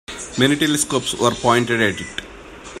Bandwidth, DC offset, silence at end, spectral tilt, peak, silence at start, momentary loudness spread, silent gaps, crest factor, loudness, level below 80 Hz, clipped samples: 16 kHz; under 0.1%; 0 s; -3.5 dB/octave; 0 dBFS; 0.1 s; 18 LU; none; 20 dB; -18 LUFS; -46 dBFS; under 0.1%